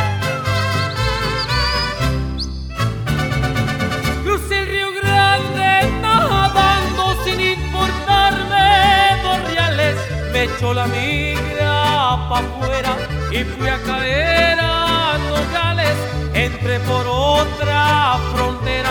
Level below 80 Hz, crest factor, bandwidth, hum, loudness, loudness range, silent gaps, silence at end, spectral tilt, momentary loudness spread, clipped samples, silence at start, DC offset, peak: -28 dBFS; 16 dB; 19.5 kHz; none; -17 LUFS; 5 LU; none; 0 s; -4.5 dB/octave; 7 LU; under 0.1%; 0 s; under 0.1%; -2 dBFS